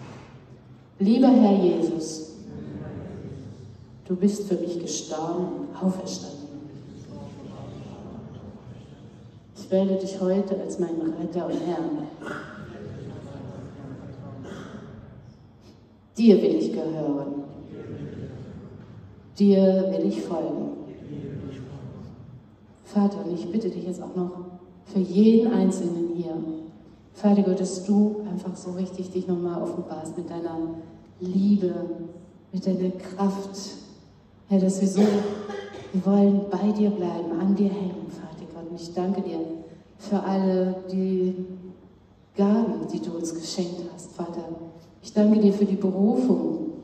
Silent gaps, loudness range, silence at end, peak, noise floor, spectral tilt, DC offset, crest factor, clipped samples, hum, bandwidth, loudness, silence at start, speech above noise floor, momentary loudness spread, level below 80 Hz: none; 9 LU; 0 s; -4 dBFS; -54 dBFS; -7.5 dB/octave; under 0.1%; 22 dB; under 0.1%; none; 9 kHz; -25 LUFS; 0 s; 30 dB; 21 LU; -62 dBFS